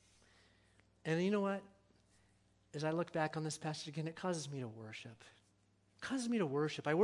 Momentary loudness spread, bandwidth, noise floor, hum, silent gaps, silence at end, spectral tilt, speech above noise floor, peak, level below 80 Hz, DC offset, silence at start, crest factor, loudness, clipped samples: 14 LU; 11.5 kHz; -74 dBFS; 60 Hz at -70 dBFS; none; 0 s; -5.5 dB/octave; 35 dB; -20 dBFS; -80 dBFS; under 0.1%; 1.05 s; 20 dB; -40 LUFS; under 0.1%